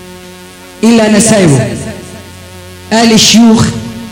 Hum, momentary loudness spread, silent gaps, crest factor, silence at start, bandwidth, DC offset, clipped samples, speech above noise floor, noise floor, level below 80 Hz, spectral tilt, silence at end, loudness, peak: none; 20 LU; none; 8 dB; 0 s; 16.5 kHz; under 0.1%; 0.5%; 25 dB; -31 dBFS; -36 dBFS; -4 dB/octave; 0 s; -7 LUFS; 0 dBFS